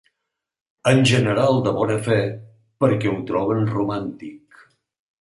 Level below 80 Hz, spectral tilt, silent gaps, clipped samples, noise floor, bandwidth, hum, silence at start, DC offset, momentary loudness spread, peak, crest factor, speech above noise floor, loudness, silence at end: -54 dBFS; -6 dB/octave; none; under 0.1%; -81 dBFS; 11.5 kHz; none; 0.85 s; under 0.1%; 13 LU; -2 dBFS; 18 dB; 62 dB; -20 LUFS; 0.85 s